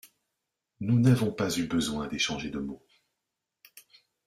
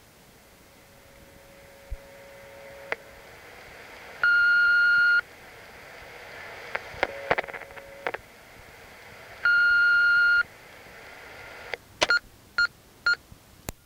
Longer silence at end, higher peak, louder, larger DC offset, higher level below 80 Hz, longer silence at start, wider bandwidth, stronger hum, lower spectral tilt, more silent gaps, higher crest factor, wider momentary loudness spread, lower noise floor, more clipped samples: first, 0.45 s vs 0.15 s; second, -12 dBFS vs -6 dBFS; second, -28 LUFS vs -23 LUFS; neither; about the same, -58 dBFS vs -54 dBFS; second, 0.8 s vs 1.9 s; about the same, 15 kHz vs 16 kHz; neither; first, -5.5 dB/octave vs -1.5 dB/octave; neither; about the same, 18 dB vs 22 dB; second, 14 LU vs 26 LU; first, -86 dBFS vs -54 dBFS; neither